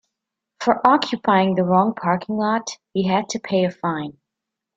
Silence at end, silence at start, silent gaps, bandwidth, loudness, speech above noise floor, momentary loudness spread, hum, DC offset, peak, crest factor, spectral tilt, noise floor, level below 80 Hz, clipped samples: 0.65 s; 0.6 s; none; 7.8 kHz; -20 LUFS; 64 dB; 9 LU; none; under 0.1%; 0 dBFS; 20 dB; -5.5 dB/octave; -84 dBFS; -62 dBFS; under 0.1%